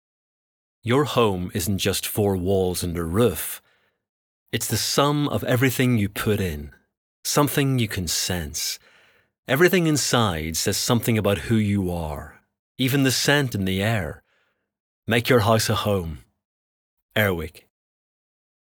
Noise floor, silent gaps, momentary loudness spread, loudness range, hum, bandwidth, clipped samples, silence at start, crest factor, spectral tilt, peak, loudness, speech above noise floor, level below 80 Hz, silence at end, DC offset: -69 dBFS; 4.09-4.46 s, 6.97-7.23 s, 9.39-9.43 s, 12.59-12.75 s, 14.80-15.03 s, 16.45-17.09 s; 11 LU; 3 LU; none; over 20 kHz; under 0.1%; 0.85 s; 20 dB; -4.5 dB/octave; -4 dBFS; -22 LUFS; 47 dB; -46 dBFS; 1.15 s; under 0.1%